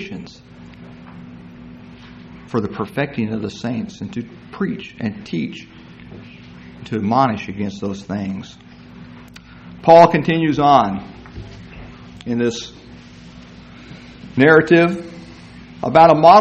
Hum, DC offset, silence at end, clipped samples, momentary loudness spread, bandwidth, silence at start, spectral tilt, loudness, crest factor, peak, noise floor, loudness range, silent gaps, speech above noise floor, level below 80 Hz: none; under 0.1%; 0 s; under 0.1%; 28 LU; 8.4 kHz; 0 s; -6.5 dB/octave; -17 LUFS; 18 dB; 0 dBFS; -40 dBFS; 12 LU; none; 25 dB; -48 dBFS